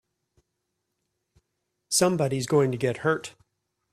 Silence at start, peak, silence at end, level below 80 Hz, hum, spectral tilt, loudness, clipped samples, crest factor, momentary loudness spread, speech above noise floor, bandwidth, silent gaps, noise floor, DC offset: 1.9 s; -8 dBFS; 0.65 s; -64 dBFS; none; -4.5 dB/octave; -25 LUFS; under 0.1%; 20 dB; 6 LU; 56 dB; 15 kHz; none; -80 dBFS; under 0.1%